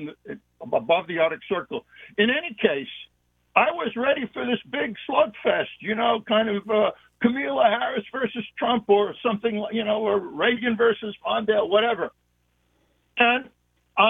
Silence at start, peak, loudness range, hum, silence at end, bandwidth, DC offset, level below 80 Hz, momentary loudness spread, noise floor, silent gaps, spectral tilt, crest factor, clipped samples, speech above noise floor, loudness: 0 s; 0 dBFS; 2 LU; 60 Hz at -65 dBFS; 0 s; 3.9 kHz; under 0.1%; -64 dBFS; 9 LU; -68 dBFS; none; -7.5 dB/octave; 24 dB; under 0.1%; 45 dB; -23 LUFS